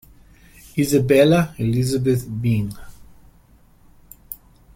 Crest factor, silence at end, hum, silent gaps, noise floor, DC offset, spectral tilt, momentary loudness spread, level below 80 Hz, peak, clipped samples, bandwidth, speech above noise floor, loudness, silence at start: 18 dB; 0.4 s; none; none; -52 dBFS; under 0.1%; -6.5 dB/octave; 22 LU; -46 dBFS; -2 dBFS; under 0.1%; 16.5 kHz; 34 dB; -19 LUFS; 0.75 s